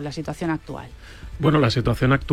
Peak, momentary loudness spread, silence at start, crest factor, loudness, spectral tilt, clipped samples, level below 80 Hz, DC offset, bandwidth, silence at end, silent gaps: -6 dBFS; 21 LU; 0 s; 16 dB; -22 LUFS; -7 dB/octave; under 0.1%; -38 dBFS; under 0.1%; 14.5 kHz; 0 s; none